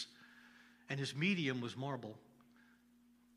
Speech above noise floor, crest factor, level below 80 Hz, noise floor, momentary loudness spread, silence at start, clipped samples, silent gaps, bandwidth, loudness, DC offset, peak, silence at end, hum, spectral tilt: 29 dB; 20 dB; -86 dBFS; -69 dBFS; 26 LU; 0 s; under 0.1%; none; 14.5 kHz; -40 LUFS; under 0.1%; -24 dBFS; 1.15 s; none; -5.5 dB/octave